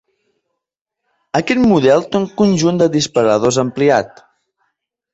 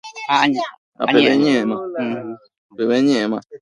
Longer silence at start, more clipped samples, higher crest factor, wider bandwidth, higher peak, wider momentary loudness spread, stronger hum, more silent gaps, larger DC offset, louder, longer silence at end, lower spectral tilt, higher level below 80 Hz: first, 1.35 s vs 0.05 s; neither; about the same, 16 dB vs 18 dB; second, 8.2 kHz vs 10.5 kHz; about the same, 0 dBFS vs 0 dBFS; second, 8 LU vs 14 LU; neither; second, none vs 0.78-0.92 s, 2.58-2.69 s; neither; first, -14 LUFS vs -18 LUFS; first, 1.05 s vs 0.05 s; about the same, -5.5 dB/octave vs -5 dB/octave; first, -50 dBFS vs -64 dBFS